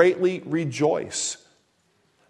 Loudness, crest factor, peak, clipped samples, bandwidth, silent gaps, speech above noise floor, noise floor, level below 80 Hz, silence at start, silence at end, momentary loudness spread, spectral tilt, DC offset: -24 LUFS; 22 dB; -4 dBFS; under 0.1%; 11 kHz; none; 44 dB; -66 dBFS; -70 dBFS; 0 s; 0.95 s; 7 LU; -4.5 dB/octave; under 0.1%